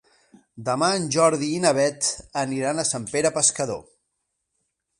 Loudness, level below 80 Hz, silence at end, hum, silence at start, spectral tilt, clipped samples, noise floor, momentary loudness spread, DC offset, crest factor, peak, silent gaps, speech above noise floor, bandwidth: -22 LUFS; -60 dBFS; 1.15 s; none; 0.55 s; -3 dB/octave; under 0.1%; -77 dBFS; 9 LU; under 0.1%; 20 dB; -4 dBFS; none; 55 dB; 11.5 kHz